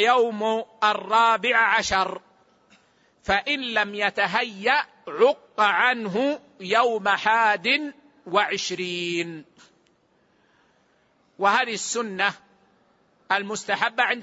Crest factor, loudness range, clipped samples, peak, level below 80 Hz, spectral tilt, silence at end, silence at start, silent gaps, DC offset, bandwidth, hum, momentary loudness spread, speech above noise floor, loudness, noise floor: 18 dB; 7 LU; under 0.1%; -6 dBFS; -58 dBFS; -2.5 dB/octave; 0 s; 0 s; none; under 0.1%; 8 kHz; none; 8 LU; 41 dB; -22 LUFS; -64 dBFS